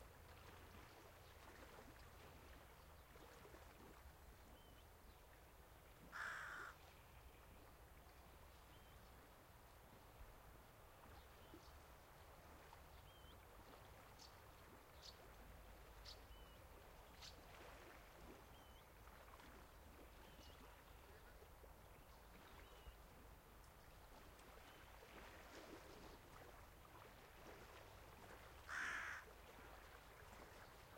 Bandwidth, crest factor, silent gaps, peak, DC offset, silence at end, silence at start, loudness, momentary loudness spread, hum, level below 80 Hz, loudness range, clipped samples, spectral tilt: 16.5 kHz; 22 dB; none; -38 dBFS; under 0.1%; 0 s; 0 s; -61 LUFS; 7 LU; none; -68 dBFS; 10 LU; under 0.1%; -3.5 dB/octave